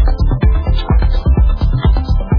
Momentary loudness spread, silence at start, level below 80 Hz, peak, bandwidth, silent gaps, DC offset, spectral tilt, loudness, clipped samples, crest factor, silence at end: 2 LU; 0 s; -12 dBFS; -2 dBFS; 5.2 kHz; none; under 0.1%; -9.5 dB/octave; -15 LUFS; under 0.1%; 10 dB; 0 s